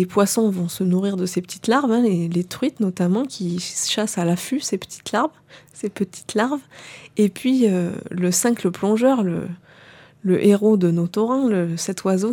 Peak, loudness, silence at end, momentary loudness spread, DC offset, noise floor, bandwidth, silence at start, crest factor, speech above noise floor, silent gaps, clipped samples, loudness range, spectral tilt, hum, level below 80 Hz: -4 dBFS; -21 LUFS; 0 s; 10 LU; under 0.1%; -47 dBFS; 18 kHz; 0 s; 16 dB; 27 dB; none; under 0.1%; 4 LU; -5.5 dB/octave; none; -64 dBFS